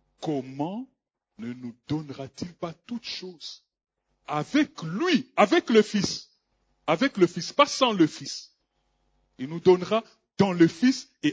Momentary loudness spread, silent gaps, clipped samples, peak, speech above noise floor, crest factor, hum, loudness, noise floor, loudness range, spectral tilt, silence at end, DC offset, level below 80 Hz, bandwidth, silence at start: 18 LU; none; under 0.1%; -4 dBFS; 48 dB; 22 dB; none; -25 LUFS; -73 dBFS; 12 LU; -5 dB/octave; 0 s; under 0.1%; -64 dBFS; 8 kHz; 0.2 s